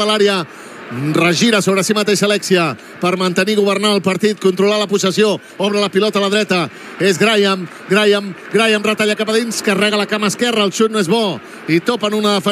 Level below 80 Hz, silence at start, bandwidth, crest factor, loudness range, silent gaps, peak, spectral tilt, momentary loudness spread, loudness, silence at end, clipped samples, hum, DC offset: -70 dBFS; 0 s; 15 kHz; 14 dB; 1 LU; none; 0 dBFS; -4 dB/octave; 6 LU; -15 LUFS; 0 s; under 0.1%; none; under 0.1%